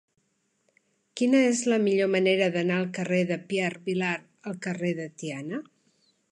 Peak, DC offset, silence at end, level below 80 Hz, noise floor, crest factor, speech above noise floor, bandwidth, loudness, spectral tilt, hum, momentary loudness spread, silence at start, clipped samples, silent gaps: -10 dBFS; under 0.1%; 0.7 s; -76 dBFS; -73 dBFS; 18 dB; 47 dB; 11 kHz; -26 LUFS; -5 dB/octave; none; 13 LU; 1.15 s; under 0.1%; none